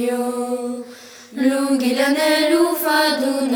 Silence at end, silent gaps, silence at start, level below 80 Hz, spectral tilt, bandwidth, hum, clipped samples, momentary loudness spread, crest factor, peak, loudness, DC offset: 0 s; none; 0 s; -66 dBFS; -2 dB/octave; over 20 kHz; none; under 0.1%; 13 LU; 14 dB; -4 dBFS; -18 LUFS; under 0.1%